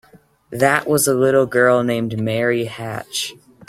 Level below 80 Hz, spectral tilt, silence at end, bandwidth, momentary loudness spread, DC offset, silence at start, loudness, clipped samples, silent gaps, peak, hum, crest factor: -56 dBFS; -4.5 dB/octave; 0.35 s; 16 kHz; 11 LU; under 0.1%; 0.5 s; -18 LUFS; under 0.1%; none; 0 dBFS; none; 18 dB